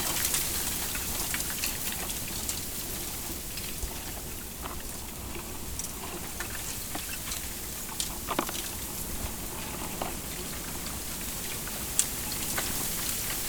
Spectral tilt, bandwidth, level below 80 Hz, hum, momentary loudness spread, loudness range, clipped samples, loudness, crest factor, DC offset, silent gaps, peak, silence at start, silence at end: -2 dB/octave; over 20 kHz; -44 dBFS; none; 8 LU; 5 LU; under 0.1%; -32 LUFS; 32 dB; under 0.1%; none; -2 dBFS; 0 s; 0 s